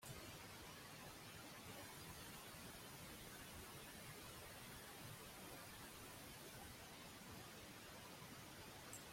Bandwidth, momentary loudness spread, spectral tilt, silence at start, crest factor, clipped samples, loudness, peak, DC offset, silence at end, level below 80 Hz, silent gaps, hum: 16.5 kHz; 2 LU; -3 dB/octave; 0 s; 18 dB; under 0.1%; -56 LUFS; -38 dBFS; under 0.1%; 0 s; -72 dBFS; none; none